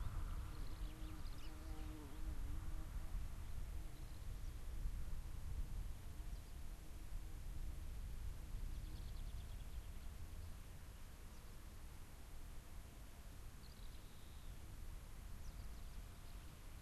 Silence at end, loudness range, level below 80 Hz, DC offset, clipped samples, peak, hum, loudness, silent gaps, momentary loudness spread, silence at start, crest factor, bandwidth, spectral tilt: 0 s; 6 LU; -50 dBFS; under 0.1%; under 0.1%; -34 dBFS; none; -55 LUFS; none; 8 LU; 0 s; 14 dB; 13 kHz; -5 dB/octave